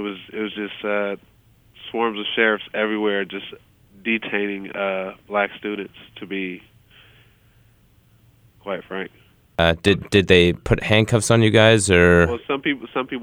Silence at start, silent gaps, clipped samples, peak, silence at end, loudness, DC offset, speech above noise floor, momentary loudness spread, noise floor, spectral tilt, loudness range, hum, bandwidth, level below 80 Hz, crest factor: 0 s; none; under 0.1%; -2 dBFS; 0 s; -20 LUFS; under 0.1%; 36 dB; 17 LU; -56 dBFS; -5 dB/octave; 18 LU; none; 16 kHz; -42 dBFS; 20 dB